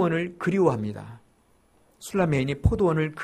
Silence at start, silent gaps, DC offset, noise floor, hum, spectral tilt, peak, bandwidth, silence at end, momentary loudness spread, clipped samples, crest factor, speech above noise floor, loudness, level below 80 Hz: 0 s; none; under 0.1%; -62 dBFS; none; -7.5 dB/octave; -6 dBFS; 14 kHz; 0 s; 17 LU; under 0.1%; 20 dB; 38 dB; -25 LUFS; -40 dBFS